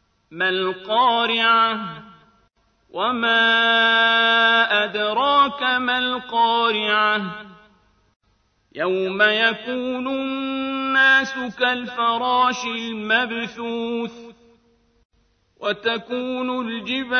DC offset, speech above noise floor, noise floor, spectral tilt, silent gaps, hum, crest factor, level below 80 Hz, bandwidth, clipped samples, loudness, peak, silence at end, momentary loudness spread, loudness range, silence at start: under 0.1%; 44 dB; -64 dBFS; -3.5 dB/octave; 8.16-8.20 s, 15.05-15.10 s; none; 18 dB; -64 dBFS; 6.6 kHz; under 0.1%; -19 LUFS; -4 dBFS; 0 s; 12 LU; 9 LU; 0.3 s